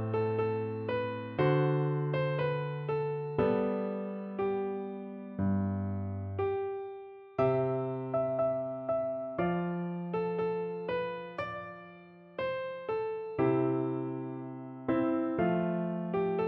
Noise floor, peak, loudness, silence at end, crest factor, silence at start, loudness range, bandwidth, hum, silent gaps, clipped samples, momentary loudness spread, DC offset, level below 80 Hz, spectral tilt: -53 dBFS; -16 dBFS; -33 LUFS; 0 s; 16 dB; 0 s; 4 LU; 5.8 kHz; none; none; under 0.1%; 10 LU; under 0.1%; -64 dBFS; -10.5 dB/octave